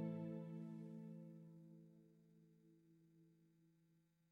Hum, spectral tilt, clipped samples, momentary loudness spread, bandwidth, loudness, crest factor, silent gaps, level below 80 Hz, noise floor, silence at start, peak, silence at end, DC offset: none; -10 dB/octave; under 0.1%; 15 LU; 5 kHz; -54 LUFS; 18 dB; none; under -90 dBFS; -79 dBFS; 0 s; -38 dBFS; 0.35 s; under 0.1%